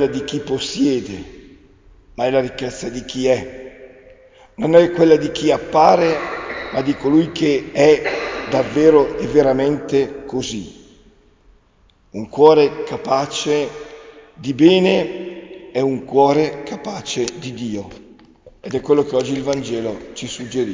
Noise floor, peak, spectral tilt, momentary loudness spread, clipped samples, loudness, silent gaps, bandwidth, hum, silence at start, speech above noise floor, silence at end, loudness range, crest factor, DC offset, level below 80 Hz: -55 dBFS; 0 dBFS; -5.5 dB/octave; 17 LU; under 0.1%; -17 LUFS; none; 7.6 kHz; none; 0 s; 38 dB; 0 s; 7 LU; 18 dB; under 0.1%; -48 dBFS